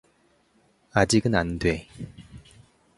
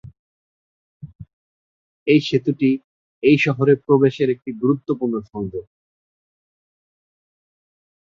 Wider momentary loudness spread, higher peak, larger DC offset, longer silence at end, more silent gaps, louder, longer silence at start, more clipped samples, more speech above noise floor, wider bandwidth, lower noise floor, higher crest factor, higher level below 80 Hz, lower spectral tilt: first, 21 LU vs 13 LU; about the same, -4 dBFS vs -2 dBFS; neither; second, 0.6 s vs 2.45 s; second, none vs 0.19-1.00 s, 1.15-1.19 s, 1.33-2.06 s, 2.84-3.22 s; second, -24 LUFS vs -19 LUFS; first, 0.95 s vs 0.05 s; neither; second, 40 dB vs over 72 dB; first, 11.5 kHz vs 7.4 kHz; second, -64 dBFS vs under -90 dBFS; about the same, 24 dB vs 20 dB; first, -44 dBFS vs -58 dBFS; second, -5 dB/octave vs -7.5 dB/octave